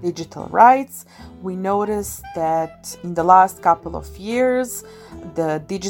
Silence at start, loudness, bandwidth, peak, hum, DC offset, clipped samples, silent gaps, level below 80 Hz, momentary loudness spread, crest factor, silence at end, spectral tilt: 0 s; -18 LUFS; 17 kHz; 0 dBFS; none; under 0.1%; under 0.1%; none; -46 dBFS; 19 LU; 20 dB; 0 s; -5 dB/octave